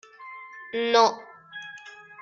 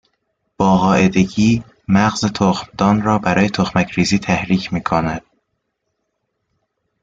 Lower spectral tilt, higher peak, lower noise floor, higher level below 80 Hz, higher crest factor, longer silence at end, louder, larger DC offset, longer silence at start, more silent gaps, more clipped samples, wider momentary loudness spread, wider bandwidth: second, -2 dB/octave vs -6 dB/octave; second, -6 dBFS vs -2 dBFS; second, -45 dBFS vs -73 dBFS; second, -76 dBFS vs -44 dBFS; first, 22 dB vs 16 dB; second, 0.3 s vs 1.85 s; second, -23 LUFS vs -16 LUFS; neither; second, 0.2 s vs 0.6 s; neither; neither; first, 23 LU vs 5 LU; about the same, 7.2 kHz vs 7.8 kHz